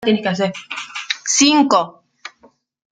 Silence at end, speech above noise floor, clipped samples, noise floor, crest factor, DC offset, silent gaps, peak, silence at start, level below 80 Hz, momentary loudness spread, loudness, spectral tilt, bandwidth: 0.65 s; 37 dB; under 0.1%; -53 dBFS; 18 dB; under 0.1%; none; 0 dBFS; 0 s; -64 dBFS; 25 LU; -16 LUFS; -2.5 dB/octave; 9.8 kHz